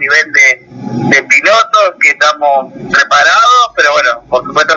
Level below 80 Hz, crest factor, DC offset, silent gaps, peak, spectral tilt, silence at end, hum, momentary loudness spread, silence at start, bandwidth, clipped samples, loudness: -52 dBFS; 8 dB; under 0.1%; none; 0 dBFS; -2.5 dB/octave; 0 s; none; 8 LU; 0 s; 8 kHz; under 0.1%; -8 LUFS